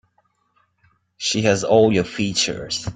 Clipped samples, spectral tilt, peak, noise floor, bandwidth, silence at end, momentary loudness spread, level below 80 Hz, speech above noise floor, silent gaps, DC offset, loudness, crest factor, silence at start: under 0.1%; -4 dB/octave; -4 dBFS; -65 dBFS; 9.4 kHz; 0.05 s; 8 LU; -52 dBFS; 47 dB; none; under 0.1%; -19 LUFS; 18 dB; 1.2 s